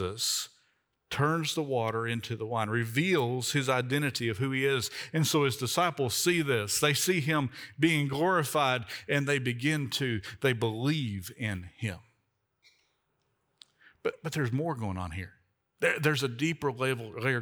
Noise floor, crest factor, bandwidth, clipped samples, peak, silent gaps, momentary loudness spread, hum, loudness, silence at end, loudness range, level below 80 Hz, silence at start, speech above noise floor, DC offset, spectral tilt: -77 dBFS; 20 dB; over 20 kHz; under 0.1%; -10 dBFS; none; 9 LU; none; -29 LUFS; 0 s; 10 LU; -68 dBFS; 0 s; 47 dB; under 0.1%; -4.5 dB/octave